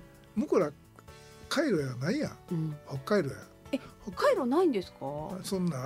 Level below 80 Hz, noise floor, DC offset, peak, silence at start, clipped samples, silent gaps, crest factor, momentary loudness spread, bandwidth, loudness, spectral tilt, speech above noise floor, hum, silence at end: -60 dBFS; -52 dBFS; under 0.1%; -14 dBFS; 0 s; under 0.1%; none; 16 dB; 12 LU; 16 kHz; -31 LUFS; -6 dB/octave; 22 dB; none; 0 s